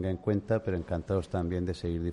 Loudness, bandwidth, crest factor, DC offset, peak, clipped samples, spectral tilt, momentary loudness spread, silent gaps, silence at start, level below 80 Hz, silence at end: -32 LUFS; 11 kHz; 16 dB; under 0.1%; -16 dBFS; under 0.1%; -8.5 dB/octave; 4 LU; none; 0 s; -48 dBFS; 0 s